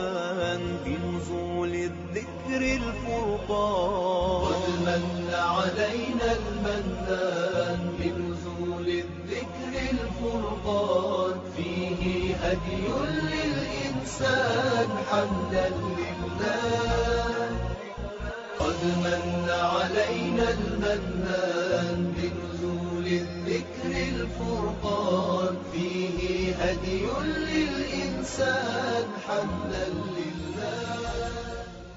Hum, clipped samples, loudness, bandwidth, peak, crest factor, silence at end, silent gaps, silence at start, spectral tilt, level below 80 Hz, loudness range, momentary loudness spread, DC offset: none; under 0.1%; -28 LUFS; 7.6 kHz; -12 dBFS; 16 dB; 0 s; none; 0 s; -4.5 dB/octave; -42 dBFS; 3 LU; 7 LU; under 0.1%